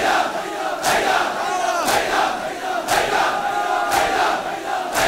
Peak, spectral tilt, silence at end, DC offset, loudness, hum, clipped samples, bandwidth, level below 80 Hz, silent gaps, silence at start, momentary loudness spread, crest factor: -4 dBFS; -2 dB/octave; 0 s; under 0.1%; -20 LUFS; none; under 0.1%; 16 kHz; -48 dBFS; none; 0 s; 7 LU; 16 dB